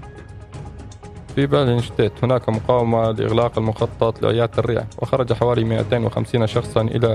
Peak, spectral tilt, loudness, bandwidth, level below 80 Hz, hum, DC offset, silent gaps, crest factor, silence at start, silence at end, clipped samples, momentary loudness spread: 0 dBFS; -7.5 dB/octave; -20 LUFS; 11 kHz; -42 dBFS; none; under 0.1%; none; 18 dB; 0 s; 0 s; under 0.1%; 18 LU